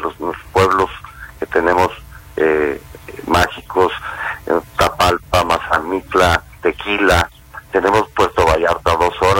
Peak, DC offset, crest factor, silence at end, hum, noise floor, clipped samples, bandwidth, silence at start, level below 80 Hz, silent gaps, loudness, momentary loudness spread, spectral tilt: 0 dBFS; under 0.1%; 16 dB; 0 s; none; -35 dBFS; under 0.1%; 16.5 kHz; 0 s; -34 dBFS; none; -16 LUFS; 12 LU; -4.5 dB/octave